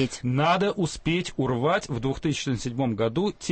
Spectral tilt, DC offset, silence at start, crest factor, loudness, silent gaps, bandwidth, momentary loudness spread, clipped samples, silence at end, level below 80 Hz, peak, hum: -5.5 dB/octave; under 0.1%; 0 s; 16 dB; -26 LUFS; none; 8.8 kHz; 5 LU; under 0.1%; 0 s; -48 dBFS; -10 dBFS; none